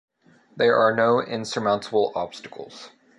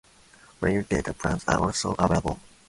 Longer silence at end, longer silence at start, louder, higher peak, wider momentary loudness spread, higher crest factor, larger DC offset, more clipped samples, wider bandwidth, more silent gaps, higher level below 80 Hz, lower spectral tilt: about the same, 0.3 s vs 0.3 s; about the same, 0.55 s vs 0.6 s; first, -22 LUFS vs -26 LUFS; about the same, -8 dBFS vs -6 dBFS; first, 20 LU vs 5 LU; about the same, 16 dB vs 20 dB; neither; neither; about the same, 11.5 kHz vs 11.5 kHz; neither; second, -66 dBFS vs -42 dBFS; about the same, -5 dB/octave vs -5 dB/octave